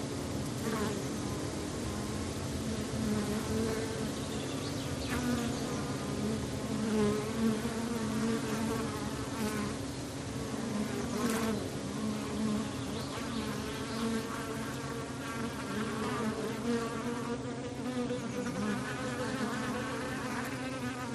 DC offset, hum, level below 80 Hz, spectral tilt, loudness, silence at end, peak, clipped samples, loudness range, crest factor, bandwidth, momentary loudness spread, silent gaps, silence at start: under 0.1%; none; -54 dBFS; -5 dB/octave; -35 LUFS; 0 s; -20 dBFS; under 0.1%; 3 LU; 16 dB; 13 kHz; 5 LU; none; 0 s